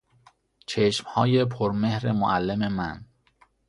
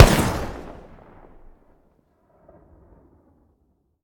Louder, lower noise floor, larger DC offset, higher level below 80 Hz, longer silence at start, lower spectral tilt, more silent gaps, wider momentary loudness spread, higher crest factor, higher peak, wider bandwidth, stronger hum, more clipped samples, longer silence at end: second, -25 LUFS vs -21 LUFS; second, -62 dBFS vs -67 dBFS; neither; second, -54 dBFS vs -30 dBFS; first, 0.7 s vs 0 s; first, -6.5 dB/octave vs -5 dB/octave; neither; second, 11 LU vs 30 LU; about the same, 20 dB vs 24 dB; second, -6 dBFS vs 0 dBFS; second, 11.5 kHz vs over 20 kHz; neither; neither; second, 0.65 s vs 3.3 s